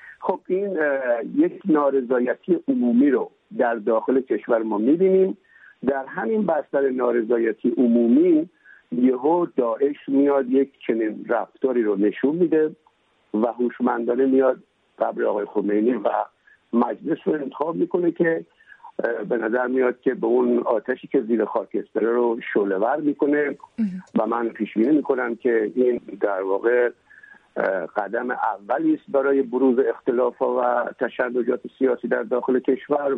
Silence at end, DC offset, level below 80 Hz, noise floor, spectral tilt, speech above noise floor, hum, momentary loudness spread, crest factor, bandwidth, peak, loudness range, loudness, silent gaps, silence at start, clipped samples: 0 s; under 0.1%; -72 dBFS; -55 dBFS; -10 dB/octave; 34 dB; none; 7 LU; 14 dB; 3.9 kHz; -8 dBFS; 3 LU; -22 LUFS; none; 0.05 s; under 0.1%